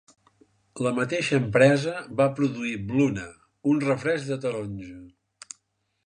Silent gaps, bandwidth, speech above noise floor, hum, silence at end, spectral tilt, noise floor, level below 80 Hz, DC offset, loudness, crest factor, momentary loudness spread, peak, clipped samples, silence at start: none; 11 kHz; 48 dB; none; 1 s; -6 dB/octave; -72 dBFS; -58 dBFS; under 0.1%; -25 LUFS; 22 dB; 23 LU; -4 dBFS; under 0.1%; 0.75 s